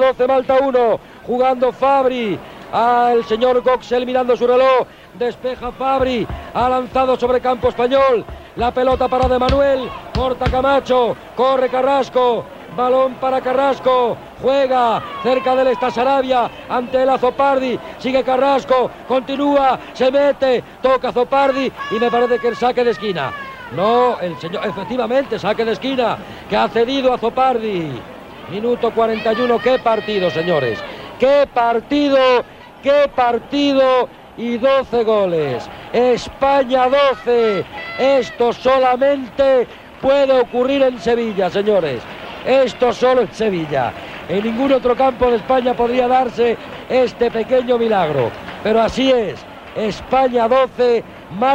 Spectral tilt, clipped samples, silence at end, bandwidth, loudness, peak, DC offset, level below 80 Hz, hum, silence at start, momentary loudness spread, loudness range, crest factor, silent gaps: -6 dB/octave; under 0.1%; 0 s; 8.6 kHz; -16 LUFS; -4 dBFS; under 0.1%; -40 dBFS; none; 0 s; 9 LU; 2 LU; 12 dB; none